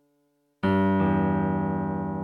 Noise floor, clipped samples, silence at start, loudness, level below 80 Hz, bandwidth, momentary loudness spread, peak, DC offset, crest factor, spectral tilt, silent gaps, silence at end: -70 dBFS; under 0.1%; 0.65 s; -25 LUFS; -52 dBFS; 4.5 kHz; 6 LU; -12 dBFS; under 0.1%; 14 dB; -10 dB/octave; none; 0 s